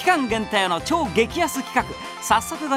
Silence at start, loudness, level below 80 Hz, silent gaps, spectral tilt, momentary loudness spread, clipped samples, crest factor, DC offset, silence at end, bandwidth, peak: 0 s; -22 LUFS; -46 dBFS; none; -3.5 dB/octave; 4 LU; under 0.1%; 18 dB; under 0.1%; 0 s; 16 kHz; -4 dBFS